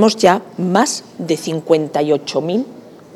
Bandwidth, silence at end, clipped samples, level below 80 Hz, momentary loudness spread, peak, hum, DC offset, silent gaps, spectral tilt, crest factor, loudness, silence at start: 15 kHz; 0.2 s; under 0.1%; -62 dBFS; 8 LU; 0 dBFS; none; under 0.1%; none; -4.5 dB/octave; 16 dB; -17 LUFS; 0 s